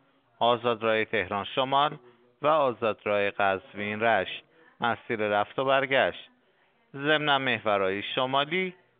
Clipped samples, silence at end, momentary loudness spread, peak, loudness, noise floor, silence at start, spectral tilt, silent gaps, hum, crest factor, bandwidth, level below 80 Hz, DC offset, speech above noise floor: under 0.1%; 0.3 s; 7 LU; -8 dBFS; -27 LUFS; -66 dBFS; 0.4 s; -2 dB/octave; none; none; 20 dB; 4.7 kHz; -72 dBFS; under 0.1%; 40 dB